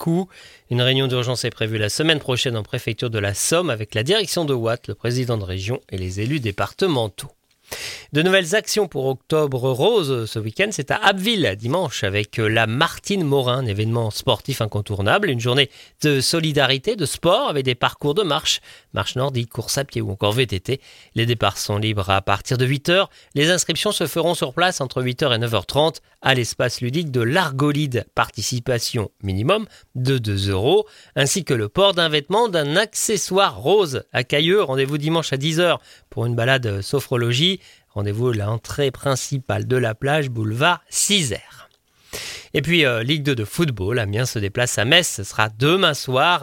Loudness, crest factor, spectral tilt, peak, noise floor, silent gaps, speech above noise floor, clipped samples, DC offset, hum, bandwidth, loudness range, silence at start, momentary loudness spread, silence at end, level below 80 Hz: -20 LUFS; 20 dB; -4 dB/octave; 0 dBFS; -46 dBFS; none; 26 dB; under 0.1%; under 0.1%; none; 17 kHz; 3 LU; 0 s; 8 LU; 0 s; -52 dBFS